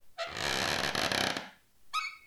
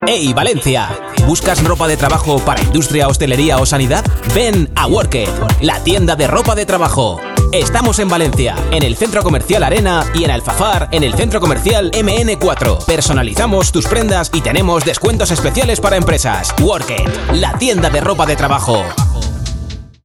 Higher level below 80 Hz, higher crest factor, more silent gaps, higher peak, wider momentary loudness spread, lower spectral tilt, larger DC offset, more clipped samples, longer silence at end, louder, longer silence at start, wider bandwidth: second, -58 dBFS vs -20 dBFS; first, 24 dB vs 12 dB; neither; second, -12 dBFS vs 0 dBFS; first, 9 LU vs 3 LU; second, -2 dB/octave vs -4.5 dB/octave; second, under 0.1% vs 0.1%; neither; second, 0 s vs 0.2 s; second, -32 LUFS vs -13 LUFS; about the same, 0.05 s vs 0 s; first, over 20 kHz vs 18 kHz